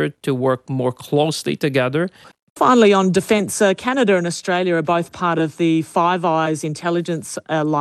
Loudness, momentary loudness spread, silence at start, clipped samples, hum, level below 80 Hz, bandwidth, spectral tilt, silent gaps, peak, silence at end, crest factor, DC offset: -18 LUFS; 8 LU; 0 s; under 0.1%; none; -62 dBFS; 13.5 kHz; -5.5 dB/octave; 2.42-2.56 s; -4 dBFS; 0 s; 14 dB; under 0.1%